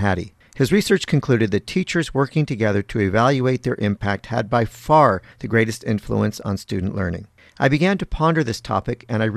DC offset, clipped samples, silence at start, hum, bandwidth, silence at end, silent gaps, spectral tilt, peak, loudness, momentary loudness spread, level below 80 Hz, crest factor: under 0.1%; under 0.1%; 0 s; none; 14 kHz; 0 s; none; -6.5 dB/octave; -2 dBFS; -20 LUFS; 8 LU; -42 dBFS; 18 dB